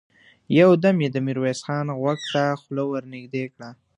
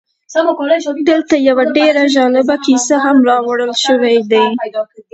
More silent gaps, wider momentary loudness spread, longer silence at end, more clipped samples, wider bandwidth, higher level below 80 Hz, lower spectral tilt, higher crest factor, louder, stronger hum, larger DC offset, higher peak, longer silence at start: neither; first, 15 LU vs 5 LU; about the same, 0.25 s vs 0.15 s; neither; first, 10.5 kHz vs 8.2 kHz; second, -66 dBFS vs -60 dBFS; first, -6.5 dB/octave vs -3 dB/octave; first, 20 dB vs 12 dB; second, -22 LUFS vs -12 LUFS; neither; neither; about the same, -2 dBFS vs 0 dBFS; first, 0.5 s vs 0.3 s